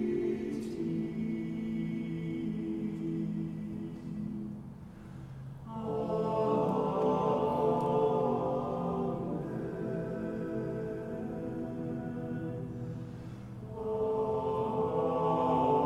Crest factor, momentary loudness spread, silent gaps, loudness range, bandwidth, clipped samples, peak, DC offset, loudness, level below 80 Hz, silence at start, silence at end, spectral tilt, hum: 18 dB; 13 LU; none; 8 LU; 11.5 kHz; under 0.1%; -16 dBFS; under 0.1%; -34 LUFS; -58 dBFS; 0 s; 0 s; -9 dB/octave; none